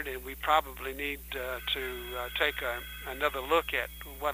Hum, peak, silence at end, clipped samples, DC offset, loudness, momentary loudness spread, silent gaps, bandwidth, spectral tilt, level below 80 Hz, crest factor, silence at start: none; -12 dBFS; 0 s; under 0.1%; under 0.1%; -32 LUFS; 10 LU; none; 16 kHz; -3 dB/octave; -48 dBFS; 22 dB; 0 s